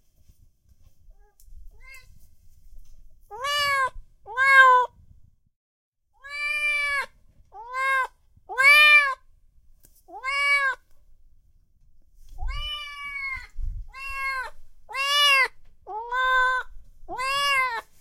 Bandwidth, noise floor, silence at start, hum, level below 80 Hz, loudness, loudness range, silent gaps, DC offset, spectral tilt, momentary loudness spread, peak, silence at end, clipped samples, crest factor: 16.5 kHz; -58 dBFS; 1.5 s; none; -44 dBFS; -21 LUFS; 14 LU; 5.56-5.92 s; under 0.1%; 0 dB/octave; 23 LU; -4 dBFS; 0.2 s; under 0.1%; 22 dB